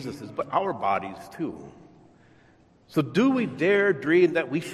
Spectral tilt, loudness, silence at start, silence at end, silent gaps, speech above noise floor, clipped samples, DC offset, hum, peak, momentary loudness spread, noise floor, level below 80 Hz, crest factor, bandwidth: -6.5 dB/octave; -25 LUFS; 0 s; 0 s; none; 33 dB; under 0.1%; under 0.1%; none; -8 dBFS; 14 LU; -58 dBFS; -66 dBFS; 16 dB; 14 kHz